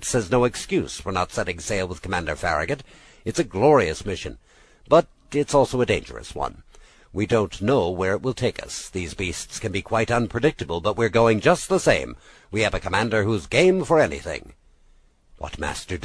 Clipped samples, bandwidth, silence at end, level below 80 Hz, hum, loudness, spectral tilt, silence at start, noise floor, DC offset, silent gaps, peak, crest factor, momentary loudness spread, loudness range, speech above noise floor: under 0.1%; 11 kHz; 0 s; -42 dBFS; none; -23 LUFS; -5 dB/octave; 0 s; -55 dBFS; under 0.1%; none; -4 dBFS; 20 dB; 13 LU; 4 LU; 33 dB